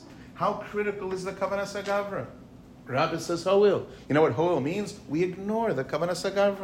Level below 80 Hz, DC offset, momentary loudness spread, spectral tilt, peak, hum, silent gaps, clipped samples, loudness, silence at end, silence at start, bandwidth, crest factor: -58 dBFS; under 0.1%; 10 LU; -5.5 dB/octave; -10 dBFS; none; none; under 0.1%; -27 LUFS; 0 s; 0 s; 15.5 kHz; 16 dB